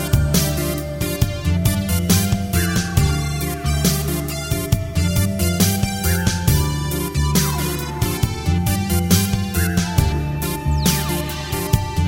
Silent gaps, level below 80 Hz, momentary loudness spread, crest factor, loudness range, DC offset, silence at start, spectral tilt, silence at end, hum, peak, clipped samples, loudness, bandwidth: none; -26 dBFS; 6 LU; 18 dB; 1 LU; under 0.1%; 0 s; -4.5 dB/octave; 0 s; none; -2 dBFS; under 0.1%; -19 LUFS; 17 kHz